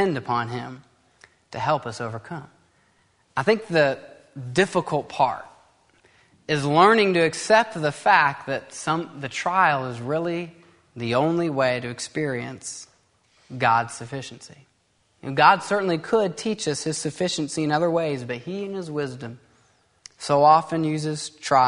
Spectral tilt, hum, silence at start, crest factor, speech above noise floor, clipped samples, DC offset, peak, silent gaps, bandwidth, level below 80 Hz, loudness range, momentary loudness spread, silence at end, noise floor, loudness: -4.5 dB/octave; none; 0 s; 22 dB; 43 dB; under 0.1%; under 0.1%; -2 dBFS; none; 11 kHz; -64 dBFS; 7 LU; 18 LU; 0 s; -66 dBFS; -23 LUFS